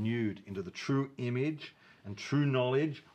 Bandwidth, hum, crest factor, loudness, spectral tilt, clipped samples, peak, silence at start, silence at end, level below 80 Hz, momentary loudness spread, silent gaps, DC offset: 8.4 kHz; none; 16 dB; -33 LUFS; -7 dB/octave; under 0.1%; -18 dBFS; 0 s; 0.15 s; -76 dBFS; 16 LU; none; under 0.1%